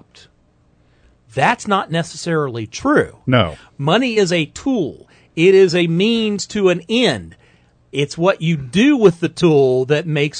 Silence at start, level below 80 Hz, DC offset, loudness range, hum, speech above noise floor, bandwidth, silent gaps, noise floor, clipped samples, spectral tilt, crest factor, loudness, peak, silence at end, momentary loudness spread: 1.35 s; -50 dBFS; under 0.1%; 3 LU; none; 40 dB; 9.4 kHz; none; -56 dBFS; under 0.1%; -5.5 dB/octave; 16 dB; -16 LUFS; 0 dBFS; 0 s; 10 LU